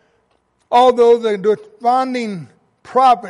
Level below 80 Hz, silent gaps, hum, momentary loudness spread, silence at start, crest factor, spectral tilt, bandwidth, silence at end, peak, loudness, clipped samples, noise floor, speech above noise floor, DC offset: -60 dBFS; none; none; 12 LU; 0.7 s; 14 dB; -5.5 dB/octave; 11 kHz; 0 s; -2 dBFS; -15 LUFS; under 0.1%; -62 dBFS; 48 dB; under 0.1%